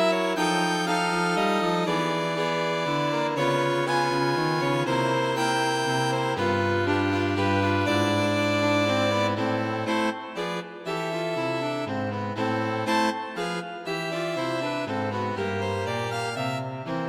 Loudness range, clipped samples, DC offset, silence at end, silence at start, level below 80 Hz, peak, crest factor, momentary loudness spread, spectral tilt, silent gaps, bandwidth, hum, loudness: 5 LU; under 0.1%; under 0.1%; 0 s; 0 s; -64 dBFS; -10 dBFS; 14 dB; 7 LU; -5 dB/octave; none; 16 kHz; none; -25 LUFS